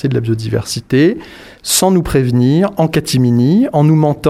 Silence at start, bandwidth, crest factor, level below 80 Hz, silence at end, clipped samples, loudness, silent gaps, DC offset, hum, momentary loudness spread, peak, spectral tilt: 0.05 s; 15 kHz; 12 dB; -38 dBFS; 0 s; under 0.1%; -13 LUFS; none; under 0.1%; none; 7 LU; 0 dBFS; -5.5 dB/octave